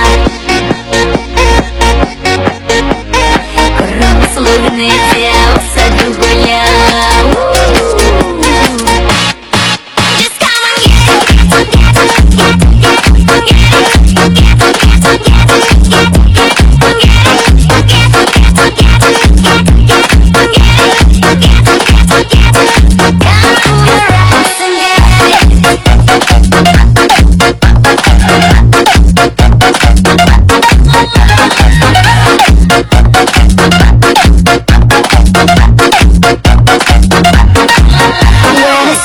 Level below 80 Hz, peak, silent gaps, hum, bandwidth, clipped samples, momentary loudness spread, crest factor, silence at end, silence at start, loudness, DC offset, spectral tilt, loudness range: -10 dBFS; 0 dBFS; none; none; 17 kHz; 0.7%; 4 LU; 4 dB; 0 s; 0 s; -6 LUFS; under 0.1%; -4.5 dB/octave; 3 LU